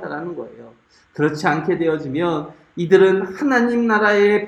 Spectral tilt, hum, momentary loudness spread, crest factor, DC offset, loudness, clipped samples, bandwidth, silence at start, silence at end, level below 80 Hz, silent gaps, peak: -6.5 dB/octave; none; 17 LU; 18 dB; under 0.1%; -18 LUFS; under 0.1%; 8.8 kHz; 0 s; 0 s; -60 dBFS; none; 0 dBFS